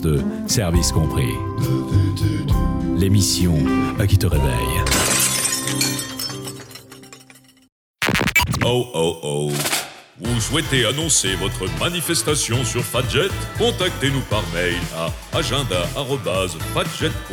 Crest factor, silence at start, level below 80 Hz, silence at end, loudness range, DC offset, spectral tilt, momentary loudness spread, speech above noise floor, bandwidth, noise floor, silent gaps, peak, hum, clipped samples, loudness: 16 dB; 0 s; -32 dBFS; 0 s; 4 LU; under 0.1%; -4 dB/octave; 7 LU; 28 dB; over 20 kHz; -48 dBFS; 7.72-7.94 s; -4 dBFS; none; under 0.1%; -19 LUFS